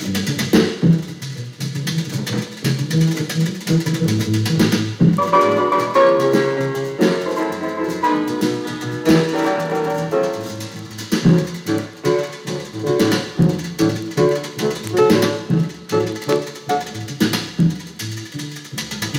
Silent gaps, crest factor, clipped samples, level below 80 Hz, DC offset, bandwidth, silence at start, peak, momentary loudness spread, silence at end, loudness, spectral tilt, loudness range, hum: none; 16 dB; under 0.1%; -52 dBFS; under 0.1%; 16.5 kHz; 0 s; -2 dBFS; 12 LU; 0 s; -19 LUFS; -6 dB/octave; 4 LU; none